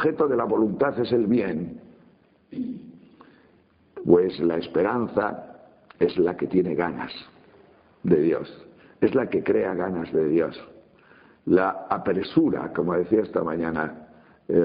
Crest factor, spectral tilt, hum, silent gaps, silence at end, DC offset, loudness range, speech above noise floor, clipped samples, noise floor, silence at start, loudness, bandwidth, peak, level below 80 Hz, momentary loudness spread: 22 dB; -6 dB/octave; none; none; 0 s; under 0.1%; 3 LU; 36 dB; under 0.1%; -59 dBFS; 0 s; -24 LUFS; 5 kHz; -4 dBFS; -58 dBFS; 13 LU